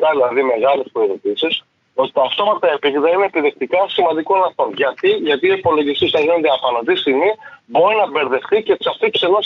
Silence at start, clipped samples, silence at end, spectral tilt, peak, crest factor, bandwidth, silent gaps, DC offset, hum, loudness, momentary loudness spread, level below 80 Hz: 0 s; under 0.1%; 0 s; -6 dB/octave; -4 dBFS; 12 dB; 6.4 kHz; none; under 0.1%; none; -16 LUFS; 4 LU; -64 dBFS